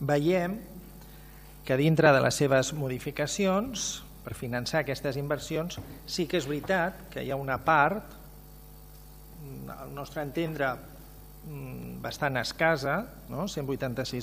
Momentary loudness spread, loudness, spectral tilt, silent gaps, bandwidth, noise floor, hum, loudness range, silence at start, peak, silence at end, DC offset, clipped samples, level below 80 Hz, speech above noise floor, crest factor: 23 LU; -29 LUFS; -5 dB/octave; none; 15.5 kHz; -49 dBFS; none; 10 LU; 0 s; -8 dBFS; 0 s; under 0.1%; under 0.1%; -52 dBFS; 20 dB; 22 dB